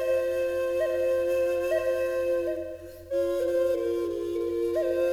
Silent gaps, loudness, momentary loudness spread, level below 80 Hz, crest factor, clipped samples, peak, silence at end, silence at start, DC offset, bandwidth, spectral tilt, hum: none; -27 LUFS; 5 LU; -56 dBFS; 10 dB; under 0.1%; -16 dBFS; 0 s; 0 s; under 0.1%; 16.5 kHz; -5.5 dB/octave; none